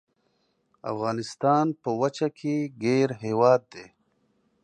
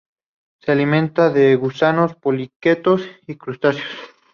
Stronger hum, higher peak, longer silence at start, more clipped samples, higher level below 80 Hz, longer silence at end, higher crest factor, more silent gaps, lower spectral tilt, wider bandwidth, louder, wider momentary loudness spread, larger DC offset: neither; second, -6 dBFS vs -2 dBFS; first, 0.85 s vs 0.65 s; neither; second, -72 dBFS vs -62 dBFS; first, 0.8 s vs 0.25 s; about the same, 20 dB vs 16 dB; second, none vs 2.56-2.60 s; second, -6.5 dB/octave vs -8 dB/octave; first, 9.6 kHz vs 6.8 kHz; second, -25 LUFS vs -17 LUFS; second, 12 LU vs 16 LU; neither